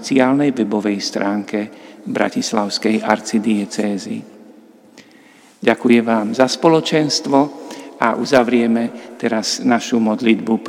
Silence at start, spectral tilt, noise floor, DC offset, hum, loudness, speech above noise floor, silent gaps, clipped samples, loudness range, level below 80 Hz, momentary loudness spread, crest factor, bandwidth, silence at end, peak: 0 s; -4.5 dB/octave; -47 dBFS; under 0.1%; none; -17 LUFS; 30 dB; none; under 0.1%; 5 LU; -68 dBFS; 11 LU; 18 dB; 14.5 kHz; 0 s; 0 dBFS